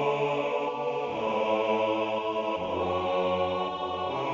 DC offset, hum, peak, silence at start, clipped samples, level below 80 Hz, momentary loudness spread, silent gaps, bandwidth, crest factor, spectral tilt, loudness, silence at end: under 0.1%; none; -14 dBFS; 0 s; under 0.1%; -56 dBFS; 4 LU; none; 7.6 kHz; 14 dB; -6 dB/octave; -29 LUFS; 0 s